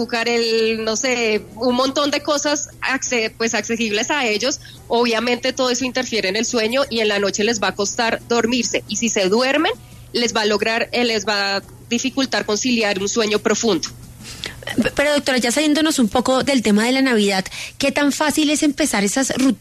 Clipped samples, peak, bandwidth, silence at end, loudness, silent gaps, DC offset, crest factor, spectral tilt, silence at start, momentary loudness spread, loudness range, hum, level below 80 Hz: under 0.1%; -4 dBFS; 13.5 kHz; 0.05 s; -18 LUFS; none; under 0.1%; 14 dB; -3 dB/octave; 0 s; 5 LU; 2 LU; none; -48 dBFS